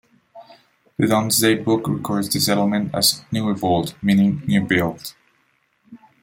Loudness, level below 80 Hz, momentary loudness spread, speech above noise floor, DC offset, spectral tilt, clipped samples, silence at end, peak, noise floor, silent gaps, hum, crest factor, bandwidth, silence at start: -19 LUFS; -56 dBFS; 7 LU; 45 dB; under 0.1%; -4.5 dB/octave; under 0.1%; 0.25 s; -2 dBFS; -64 dBFS; none; none; 18 dB; 16.5 kHz; 0.35 s